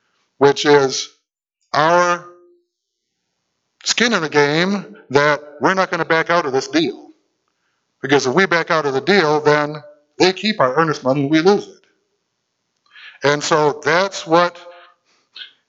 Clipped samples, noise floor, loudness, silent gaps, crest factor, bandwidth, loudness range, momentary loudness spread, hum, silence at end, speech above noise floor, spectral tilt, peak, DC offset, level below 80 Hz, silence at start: under 0.1%; -76 dBFS; -16 LUFS; none; 18 dB; 8 kHz; 3 LU; 8 LU; none; 0.25 s; 60 dB; -4 dB/octave; 0 dBFS; under 0.1%; -64 dBFS; 0.4 s